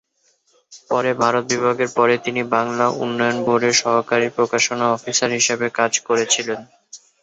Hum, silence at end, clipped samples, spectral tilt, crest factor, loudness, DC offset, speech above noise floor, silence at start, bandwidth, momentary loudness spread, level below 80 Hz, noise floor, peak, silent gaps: none; 0.25 s; under 0.1%; -2.5 dB/octave; 18 dB; -18 LUFS; under 0.1%; 44 dB; 0.7 s; 8.2 kHz; 4 LU; -64 dBFS; -63 dBFS; -2 dBFS; none